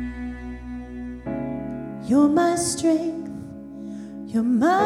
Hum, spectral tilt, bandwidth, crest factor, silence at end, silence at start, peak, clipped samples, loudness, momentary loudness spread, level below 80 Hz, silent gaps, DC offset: none; -5 dB/octave; 14.5 kHz; 16 dB; 0 s; 0 s; -8 dBFS; under 0.1%; -23 LUFS; 17 LU; -44 dBFS; none; under 0.1%